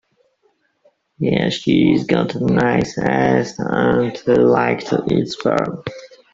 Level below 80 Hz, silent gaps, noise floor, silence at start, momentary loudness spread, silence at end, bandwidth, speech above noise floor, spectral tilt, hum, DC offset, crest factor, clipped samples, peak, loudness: -48 dBFS; none; -63 dBFS; 1.2 s; 6 LU; 0.25 s; 7.8 kHz; 47 dB; -6.5 dB/octave; none; under 0.1%; 16 dB; under 0.1%; -2 dBFS; -17 LUFS